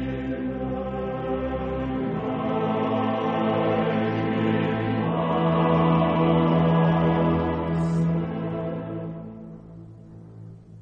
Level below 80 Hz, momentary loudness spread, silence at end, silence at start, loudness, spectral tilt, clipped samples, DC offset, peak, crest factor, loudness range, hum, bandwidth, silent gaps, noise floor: -44 dBFS; 21 LU; 0 s; 0 s; -24 LUFS; -9 dB/octave; under 0.1%; under 0.1%; -8 dBFS; 16 dB; 6 LU; none; 4.8 kHz; none; -44 dBFS